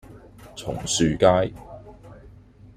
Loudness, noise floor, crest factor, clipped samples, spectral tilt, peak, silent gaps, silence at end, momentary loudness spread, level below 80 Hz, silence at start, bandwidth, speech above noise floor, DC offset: -22 LUFS; -48 dBFS; 22 dB; under 0.1%; -4.5 dB/octave; -4 dBFS; none; 0.5 s; 24 LU; -46 dBFS; 0.1 s; 15.5 kHz; 27 dB; under 0.1%